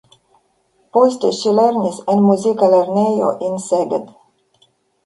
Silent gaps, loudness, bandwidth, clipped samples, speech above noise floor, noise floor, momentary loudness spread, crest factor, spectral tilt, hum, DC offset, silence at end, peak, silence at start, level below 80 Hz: none; -16 LUFS; 11.5 kHz; under 0.1%; 46 dB; -61 dBFS; 7 LU; 16 dB; -6.5 dB/octave; none; under 0.1%; 1 s; 0 dBFS; 0.95 s; -64 dBFS